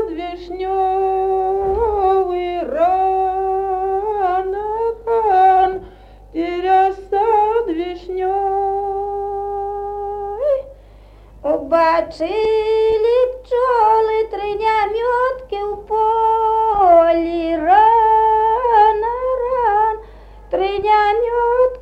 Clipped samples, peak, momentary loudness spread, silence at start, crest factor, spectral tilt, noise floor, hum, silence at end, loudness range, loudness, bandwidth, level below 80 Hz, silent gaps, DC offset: under 0.1%; -2 dBFS; 11 LU; 0 s; 16 dB; -6.5 dB/octave; -42 dBFS; 50 Hz at -45 dBFS; 0 s; 7 LU; -17 LUFS; 8.4 kHz; -42 dBFS; none; under 0.1%